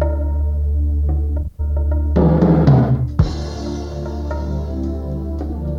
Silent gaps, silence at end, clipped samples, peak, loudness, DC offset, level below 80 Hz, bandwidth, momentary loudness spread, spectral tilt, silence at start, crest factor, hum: none; 0 s; under 0.1%; -2 dBFS; -19 LUFS; under 0.1%; -20 dBFS; 6.8 kHz; 12 LU; -9.5 dB/octave; 0 s; 16 dB; none